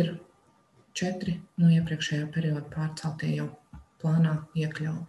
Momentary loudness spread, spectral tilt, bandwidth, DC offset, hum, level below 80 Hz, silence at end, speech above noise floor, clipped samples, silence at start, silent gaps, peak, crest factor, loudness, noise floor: 11 LU; -6.5 dB/octave; 11 kHz; under 0.1%; none; -58 dBFS; 0 s; 36 dB; under 0.1%; 0 s; none; -12 dBFS; 16 dB; -29 LUFS; -63 dBFS